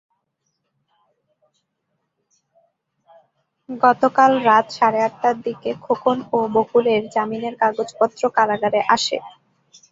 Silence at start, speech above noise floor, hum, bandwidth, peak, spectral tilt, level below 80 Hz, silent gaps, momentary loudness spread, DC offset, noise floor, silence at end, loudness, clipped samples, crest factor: 3.7 s; 56 dB; none; 7.8 kHz; -2 dBFS; -4 dB/octave; -66 dBFS; none; 9 LU; under 0.1%; -74 dBFS; 0.6 s; -19 LUFS; under 0.1%; 18 dB